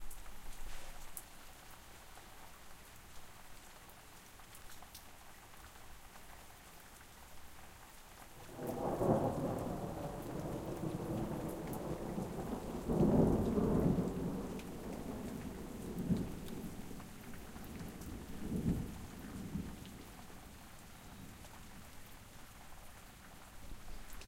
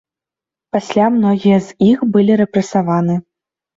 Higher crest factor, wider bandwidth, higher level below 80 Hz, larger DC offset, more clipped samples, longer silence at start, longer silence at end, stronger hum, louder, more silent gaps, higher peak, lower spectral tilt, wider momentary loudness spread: first, 24 dB vs 14 dB; first, 16.5 kHz vs 7.8 kHz; about the same, -52 dBFS vs -54 dBFS; neither; neither; second, 0 s vs 0.75 s; second, 0 s vs 0.55 s; neither; second, -40 LUFS vs -14 LUFS; neither; second, -18 dBFS vs -2 dBFS; about the same, -7 dB/octave vs -7.5 dB/octave; first, 22 LU vs 8 LU